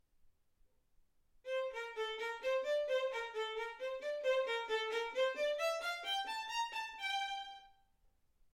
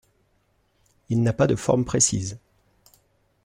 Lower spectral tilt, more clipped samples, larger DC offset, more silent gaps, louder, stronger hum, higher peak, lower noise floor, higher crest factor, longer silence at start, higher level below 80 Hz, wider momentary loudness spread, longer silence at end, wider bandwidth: second, 1 dB/octave vs -5 dB/octave; neither; neither; neither; second, -39 LUFS vs -22 LUFS; neither; second, -24 dBFS vs -6 dBFS; first, -73 dBFS vs -67 dBFS; about the same, 16 dB vs 20 dB; second, 0.25 s vs 1.1 s; second, -74 dBFS vs -50 dBFS; second, 7 LU vs 12 LU; second, 0.85 s vs 1.1 s; about the same, 16.5 kHz vs 15 kHz